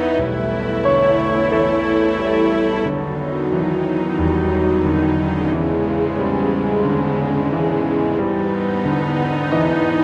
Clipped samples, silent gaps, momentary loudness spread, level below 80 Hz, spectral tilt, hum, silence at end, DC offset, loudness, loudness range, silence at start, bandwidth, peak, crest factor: under 0.1%; none; 4 LU; -36 dBFS; -9 dB/octave; none; 0 s; under 0.1%; -18 LUFS; 1 LU; 0 s; 7.4 kHz; -4 dBFS; 12 dB